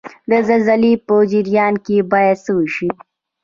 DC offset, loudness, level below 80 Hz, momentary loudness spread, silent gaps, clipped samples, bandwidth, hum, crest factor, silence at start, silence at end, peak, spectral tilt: under 0.1%; -15 LUFS; -56 dBFS; 7 LU; none; under 0.1%; 7.4 kHz; none; 14 dB; 0.05 s; 0.5 s; -2 dBFS; -7.5 dB/octave